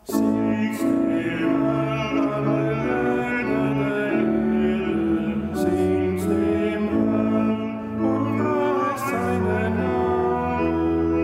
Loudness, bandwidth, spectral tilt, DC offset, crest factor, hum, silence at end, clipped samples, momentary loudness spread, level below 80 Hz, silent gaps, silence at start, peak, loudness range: -22 LUFS; 16 kHz; -7.5 dB/octave; under 0.1%; 12 dB; none; 0 s; under 0.1%; 2 LU; -46 dBFS; none; 0.05 s; -8 dBFS; 1 LU